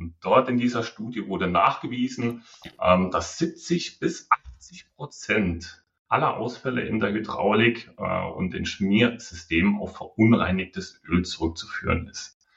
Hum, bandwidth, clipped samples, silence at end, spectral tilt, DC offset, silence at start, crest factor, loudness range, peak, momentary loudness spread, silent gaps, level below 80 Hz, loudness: none; 8 kHz; under 0.1%; 0.3 s; -5.5 dB/octave; under 0.1%; 0 s; 20 dB; 3 LU; -6 dBFS; 14 LU; 5.99-6.05 s; -48 dBFS; -25 LUFS